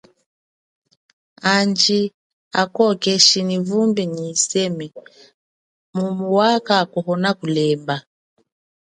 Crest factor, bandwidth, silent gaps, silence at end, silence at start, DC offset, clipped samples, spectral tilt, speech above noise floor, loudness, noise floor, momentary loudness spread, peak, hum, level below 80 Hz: 20 dB; 11 kHz; 2.14-2.51 s, 5.34-5.93 s; 0.9 s; 1.45 s; under 0.1%; under 0.1%; -3.5 dB/octave; over 72 dB; -18 LUFS; under -90 dBFS; 13 LU; 0 dBFS; none; -66 dBFS